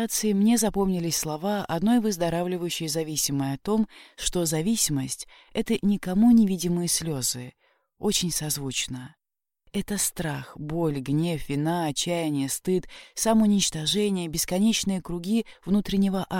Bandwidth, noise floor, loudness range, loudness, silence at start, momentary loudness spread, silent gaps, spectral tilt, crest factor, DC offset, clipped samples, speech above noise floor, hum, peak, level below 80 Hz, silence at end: 17 kHz; -65 dBFS; 5 LU; -25 LUFS; 0 s; 10 LU; none; -4.5 dB/octave; 16 dB; under 0.1%; under 0.1%; 40 dB; none; -10 dBFS; -48 dBFS; 0 s